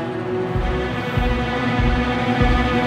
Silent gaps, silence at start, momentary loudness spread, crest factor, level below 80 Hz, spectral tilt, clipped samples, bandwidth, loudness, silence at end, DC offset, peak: none; 0 s; 5 LU; 14 dB; -26 dBFS; -7 dB/octave; under 0.1%; 10 kHz; -20 LUFS; 0 s; under 0.1%; -4 dBFS